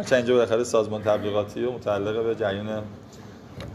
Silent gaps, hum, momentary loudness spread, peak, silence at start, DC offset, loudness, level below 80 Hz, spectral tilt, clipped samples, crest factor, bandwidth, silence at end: none; none; 21 LU; -6 dBFS; 0 s; under 0.1%; -25 LUFS; -56 dBFS; -5.5 dB/octave; under 0.1%; 18 dB; 14 kHz; 0 s